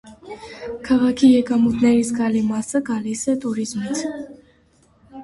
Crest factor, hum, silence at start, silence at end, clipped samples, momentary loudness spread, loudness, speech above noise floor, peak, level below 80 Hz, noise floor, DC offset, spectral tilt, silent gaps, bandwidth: 16 dB; none; 0.05 s; 0 s; under 0.1%; 20 LU; -19 LUFS; 38 dB; -4 dBFS; -52 dBFS; -57 dBFS; under 0.1%; -5 dB/octave; none; 11.5 kHz